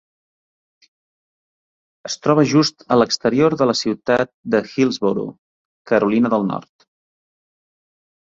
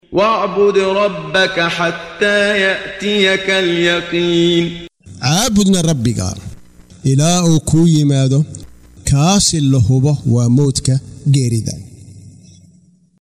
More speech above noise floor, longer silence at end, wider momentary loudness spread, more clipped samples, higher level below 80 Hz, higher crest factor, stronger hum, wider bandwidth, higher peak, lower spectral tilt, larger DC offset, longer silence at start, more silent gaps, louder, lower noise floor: first, over 73 dB vs 36 dB; first, 1.75 s vs 0.9 s; about the same, 10 LU vs 9 LU; neither; second, -60 dBFS vs -38 dBFS; about the same, 18 dB vs 14 dB; neither; second, 7.8 kHz vs 15.5 kHz; about the same, -2 dBFS vs 0 dBFS; about the same, -5.5 dB/octave vs -5 dB/octave; neither; first, 2.05 s vs 0.1 s; first, 4.34-4.43 s, 5.38-5.85 s vs none; second, -18 LUFS vs -14 LUFS; first, under -90 dBFS vs -49 dBFS